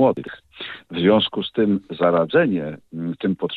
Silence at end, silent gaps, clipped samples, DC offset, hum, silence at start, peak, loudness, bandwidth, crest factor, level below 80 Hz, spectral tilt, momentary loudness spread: 0 s; none; under 0.1%; under 0.1%; none; 0 s; -4 dBFS; -20 LUFS; 4.7 kHz; 18 dB; -60 dBFS; -8.5 dB/octave; 16 LU